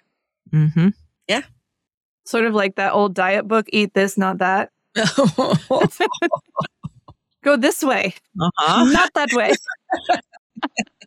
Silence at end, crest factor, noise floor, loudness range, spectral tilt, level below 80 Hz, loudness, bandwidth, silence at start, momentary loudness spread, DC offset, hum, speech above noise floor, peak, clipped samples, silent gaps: 0.2 s; 16 dB; -57 dBFS; 2 LU; -5 dB/octave; -52 dBFS; -19 LUFS; 17 kHz; 0.5 s; 10 LU; under 0.1%; none; 38 dB; -4 dBFS; under 0.1%; 1.94-2.18 s, 10.38-10.50 s